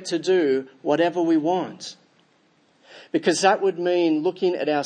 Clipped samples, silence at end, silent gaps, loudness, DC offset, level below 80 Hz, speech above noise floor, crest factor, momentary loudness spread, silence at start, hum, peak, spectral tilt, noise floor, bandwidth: under 0.1%; 0 s; none; -22 LUFS; under 0.1%; -80 dBFS; 40 dB; 18 dB; 8 LU; 0 s; none; -4 dBFS; -4.5 dB/octave; -61 dBFS; 9.8 kHz